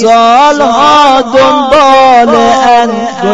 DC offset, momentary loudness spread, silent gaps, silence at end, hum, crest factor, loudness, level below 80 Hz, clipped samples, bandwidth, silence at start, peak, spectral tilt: 2%; 3 LU; none; 0 s; none; 4 dB; -5 LUFS; -38 dBFS; 4%; 12 kHz; 0 s; 0 dBFS; -3.5 dB/octave